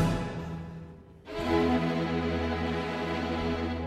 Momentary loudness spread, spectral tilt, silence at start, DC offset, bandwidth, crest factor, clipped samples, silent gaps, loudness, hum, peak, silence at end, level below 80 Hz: 15 LU; -7 dB/octave; 0 s; under 0.1%; 13.5 kHz; 16 dB; under 0.1%; none; -30 LUFS; none; -14 dBFS; 0 s; -44 dBFS